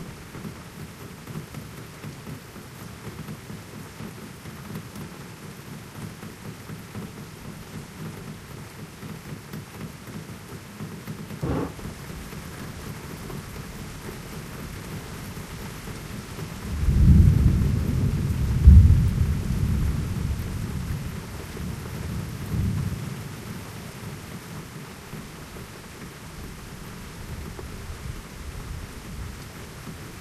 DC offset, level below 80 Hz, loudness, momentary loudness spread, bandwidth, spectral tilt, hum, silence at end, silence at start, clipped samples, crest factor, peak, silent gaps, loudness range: under 0.1%; -30 dBFS; -27 LUFS; 16 LU; 14.5 kHz; -6.5 dB/octave; none; 0 s; 0 s; under 0.1%; 26 dB; 0 dBFS; none; 18 LU